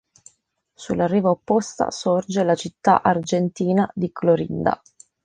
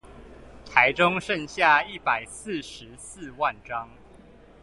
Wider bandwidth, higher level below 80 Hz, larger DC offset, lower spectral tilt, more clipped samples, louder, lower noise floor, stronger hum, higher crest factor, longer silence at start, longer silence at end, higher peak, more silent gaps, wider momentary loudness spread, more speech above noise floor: second, 9.8 kHz vs 11.5 kHz; about the same, -56 dBFS vs -54 dBFS; neither; first, -6 dB/octave vs -3.5 dB/octave; neither; first, -21 LUFS vs -24 LUFS; first, -67 dBFS vs -51 dBFS; neither; about the same, 20 dB vs 24 dB; first, 0.8 s vs 0.1 s; second, 0.5 s vs 0.8 s; about the same, -2 dBFS vs -2 dBFS; neither; second, 6 LU vs 21 LU; first, 46 dB vs 24 dB